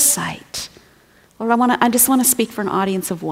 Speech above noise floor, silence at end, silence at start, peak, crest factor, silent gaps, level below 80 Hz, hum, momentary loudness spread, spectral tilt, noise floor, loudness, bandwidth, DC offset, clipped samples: 35 dB; 0 s; 0 s; 0 dBFS; 18 dB; none; -56 dBFS; none; 15 LU; -3 dB/octave; -52 dBFS; -17 LUFS; 16.5 kHz; under 0.1%; under 0.1%